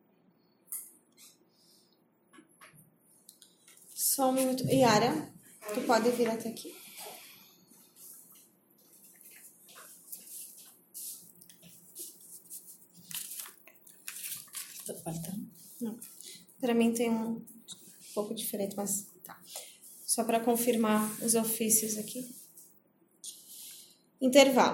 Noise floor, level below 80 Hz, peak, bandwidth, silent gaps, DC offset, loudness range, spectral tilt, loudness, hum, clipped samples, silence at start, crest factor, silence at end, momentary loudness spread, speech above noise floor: -69 dBFS; -76 dBFS; -6 dBFS; 17 kHz; none; under 0.1%; 20 LU; -3.5 dB/octave; -30 LUFS; none; under 0.1%; 0.7 s; 28 dB; 0 s; 24 LU; 40 dB